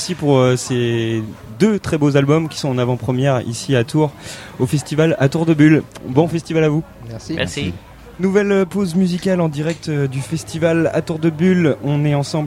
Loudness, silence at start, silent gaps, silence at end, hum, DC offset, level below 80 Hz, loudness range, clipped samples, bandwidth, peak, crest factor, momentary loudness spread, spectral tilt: -17 LUFS; 0 s; none; 0 s; none; under 0.1%; -48 dBFS; 2 LU; under 0.1%; 15.5 kHz; 0 dBFS; 16 dB; 9 LU; -6.5 dB/octave